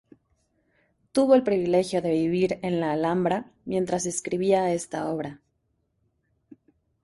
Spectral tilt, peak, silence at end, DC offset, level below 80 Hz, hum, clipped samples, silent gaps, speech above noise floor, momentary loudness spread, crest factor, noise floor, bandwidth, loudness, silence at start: -5.5 dB/octave; -8 dBFS; 1.65 s; under 0.1%; -62 dBFS; none; under 0.1%; none; 49 dB; 10 LU; 20 dB; -73 dBFS; 11.5 kHz; -25 LUFS; 1.15 s